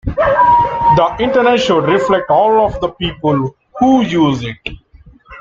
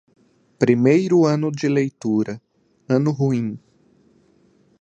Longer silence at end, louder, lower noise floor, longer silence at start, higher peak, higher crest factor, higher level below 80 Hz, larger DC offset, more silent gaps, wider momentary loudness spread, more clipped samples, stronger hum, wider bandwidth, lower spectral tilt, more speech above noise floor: second, 0 s vs 1.25 s; first, -12 LUFS vs -19 LUFS; second, -43 dBFS vs -58 dBFS; second, 0.05 s vs 0.6 s; about the same, -2 dBFS vs -2 dBFS; second, 12 dB vs 18 dB; first, -36 dBFS vs -64 dBFS; neither; neither; second, 9 LU vs 13 LU; neither; neither; second, 7.6 kHz vs 8.6 kHz; about the same, -6.5 dB/octave vs -7.5 dB/octave; second, 30 dB vs 39 dB